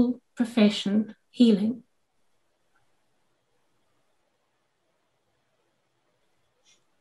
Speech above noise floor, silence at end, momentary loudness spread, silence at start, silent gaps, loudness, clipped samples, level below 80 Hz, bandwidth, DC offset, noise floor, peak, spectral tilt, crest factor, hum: 52 dB; 5.2 s; 12 LU; 0 s; none; -24 LUFS; under 0.1%; -76 dBFS; 11.5 kHz; under 0.1%; -75 dBFS; -8 dBFS; -6.5 dB/octave; 22 dB; none